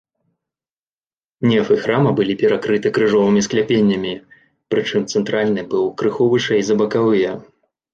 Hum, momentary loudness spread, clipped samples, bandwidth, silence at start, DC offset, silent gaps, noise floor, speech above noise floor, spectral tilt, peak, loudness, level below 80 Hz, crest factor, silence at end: none; 6 LU; under 0.1%; 7.8 kHz; 1.4 s; under 0.1%; none; under -90 dBFS; over 74 dB; -5.5 dB/octave; -4 dBFS; -17 LUFS; -56 dBFS; 14 dB; 0.5 s